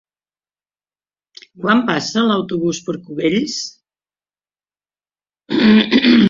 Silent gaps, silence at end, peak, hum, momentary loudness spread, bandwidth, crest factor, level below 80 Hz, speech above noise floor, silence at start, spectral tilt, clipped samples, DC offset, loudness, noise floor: none; 0 s; -2 dBFS; 50 Hz at -50 dBFS; 13 LU; 7.6 kHz; 16 dB; -56 dBFS; over 72 dB; 1.6 s; -5 dB/octave; under 0.1%; under 0.1%; -16 LUFS; under -90 dBFS